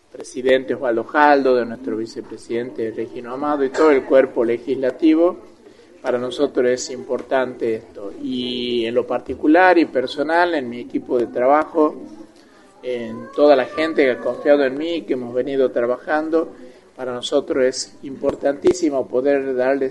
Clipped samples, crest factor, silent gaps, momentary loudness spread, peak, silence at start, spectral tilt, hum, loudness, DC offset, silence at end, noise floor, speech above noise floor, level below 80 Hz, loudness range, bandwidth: under 0.1%; 18 dB; none; 13 LU; 0 dBFS; 0.2 s; -4.5 dB/octave; none; -19 LUFS; under 0.1%; 0 s; -48 dBFS; 29 dB; -56 dBFS; 4 LU; 11 kHz